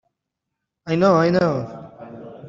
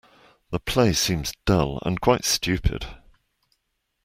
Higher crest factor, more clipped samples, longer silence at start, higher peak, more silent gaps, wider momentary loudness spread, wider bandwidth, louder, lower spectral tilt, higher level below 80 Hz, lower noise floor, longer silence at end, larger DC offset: about the same, 18 dB vs 22 dB; neither; first, 0.85 s vs 0.5 s; about the same, -4 dBFS vs -4 dBFS; neither; first, 23 LU vs 11 LU; second, 7.4 kHz vs 16 kHz; first, -18 LUFS vs -23 LUFS; first, -7.5 dB/octave vs -4.5 dB/octave; second, -58 dBFS vs -38 dBFS; first, -81 dBFS vs -76 dBFS; second, 0 s vs 1.1 s; neither